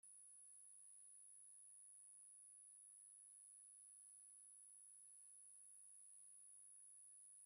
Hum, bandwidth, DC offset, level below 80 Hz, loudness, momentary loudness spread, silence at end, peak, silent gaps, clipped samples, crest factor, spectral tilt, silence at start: none; 14 kHz; under 0.1%; under -90 dBFS; -62 LUFS; 0 LU; 0 s; -56 dBFS; none; under 0.1%; 8 dB; 2 dB/octave; 0.05 s